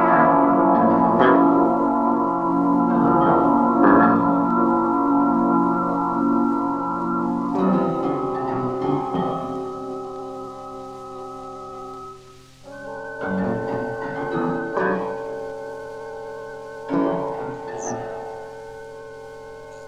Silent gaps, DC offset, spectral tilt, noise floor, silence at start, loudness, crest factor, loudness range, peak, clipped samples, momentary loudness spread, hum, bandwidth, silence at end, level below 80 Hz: none; 0.2%; -7.5 dB/octave; -46 dBFS; 0 s; -20 LUFS; 18 dB; 13 LU; -2 dBFS; under 0.1%; 19 LU; none; 8 kHz; 0 s; -54 dBFS